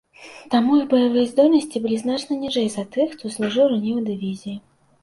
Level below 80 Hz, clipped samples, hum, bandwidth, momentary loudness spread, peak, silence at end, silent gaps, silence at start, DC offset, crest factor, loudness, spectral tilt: -62 dBFS; under 0.1%; none; 11.5 kHz; 11 LU; -4 dBFS; 0.45 s; none; 0.2 s; under 0.1%; 16 dB; -20 LUFS; -5.5 dB/octave